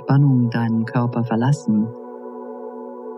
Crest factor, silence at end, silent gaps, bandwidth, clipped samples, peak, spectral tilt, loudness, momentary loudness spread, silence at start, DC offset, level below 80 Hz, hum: 14 dB; 0 s; none; 8.6 kHz; under 0.1%; -6 dBFS; -8.5 dB/octave; -19 LUFS; 17 LU; 0 s; under 0.1%; -76 dBFS; none